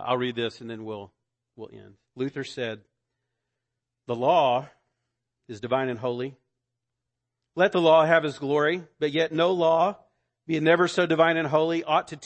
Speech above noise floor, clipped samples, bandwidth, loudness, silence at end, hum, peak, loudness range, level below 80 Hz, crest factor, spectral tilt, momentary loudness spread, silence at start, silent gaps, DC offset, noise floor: 60 dB; under 0.1%; 8.6 kHz; -24 LUFS; 0.05 s; none; -6 dBFS; 12 LU; -72 dBFS; 20 dB; -5.5 dB/octave; 17 LU; 0 s; none; under 0.1%; -84 dBFS